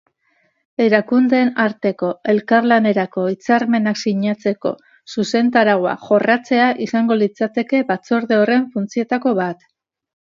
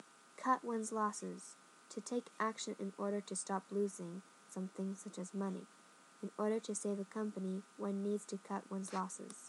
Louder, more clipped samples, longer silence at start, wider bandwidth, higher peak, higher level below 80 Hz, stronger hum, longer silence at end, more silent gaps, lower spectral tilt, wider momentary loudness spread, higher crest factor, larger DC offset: first, -17 LUFS vs -42 LUFS; neither; first, 0.8 s vs 0 s; second, 7.4 kHz vs 12 kHz; first, 0 dBFS vs -20 dBFS; first, -68 dBFS vs under -90 dBFS; neither; first, 0.7 s vs 0 s; neither; about the same, -6 dB/octave vs -5 dB/octave; second, 8 LU vs 12 LU; second, 16 dB vs 22 dB; neither